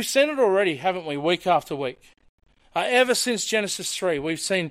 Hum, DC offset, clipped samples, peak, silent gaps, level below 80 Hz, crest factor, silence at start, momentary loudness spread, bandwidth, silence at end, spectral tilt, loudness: none; under 0.1%; under 0.1%; -6 dBFS; 2.29-2.38 s; -62 dBFS; 18 dB; 0 s; 8 LU; 16 kHz; 0 s; -3 dB/octave; -23 LUFS